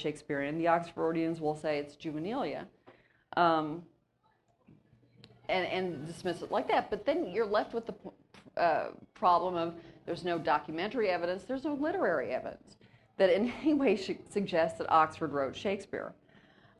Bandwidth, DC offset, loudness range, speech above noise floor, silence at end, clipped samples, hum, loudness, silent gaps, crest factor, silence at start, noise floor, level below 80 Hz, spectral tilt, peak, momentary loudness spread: 12 kHz; under 0.1%; 5 LU; 41 dB; 0.65 s; under 0.1%; none; -32 LUFS; none; 20 dB; 0 s; -73 dBFS; -66 dBFS; -6 dB/octave; -12 dBFS; 13 LU